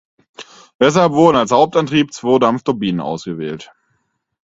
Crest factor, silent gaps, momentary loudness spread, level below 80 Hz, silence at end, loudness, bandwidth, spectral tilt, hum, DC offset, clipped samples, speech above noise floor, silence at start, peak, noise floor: 16 dB; 0.75-0.79 s; 13 LU; -54 dBFS; 0.85 s; -15 LUFS; 8 kHz; -5.5 dB/octave; none; under 0.1%; under 0.1%; 53 dB; 0.4 s; 0 dBFS; -67 dBFS